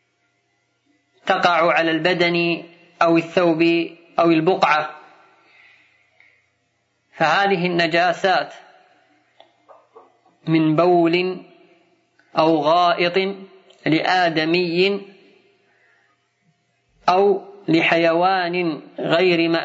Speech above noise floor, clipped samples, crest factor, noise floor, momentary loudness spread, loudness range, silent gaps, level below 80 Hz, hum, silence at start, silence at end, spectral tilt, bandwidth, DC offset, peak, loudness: 50 dB; under 0.1%; 18 dB; -68 dBFS; 10 LU; 4 LU; none; -72 dBFS; none; 1.25 s; 0 s; -6 dB/octave; 7.8 kHz; under 0.1%; -2 dBFS; -18 LUFS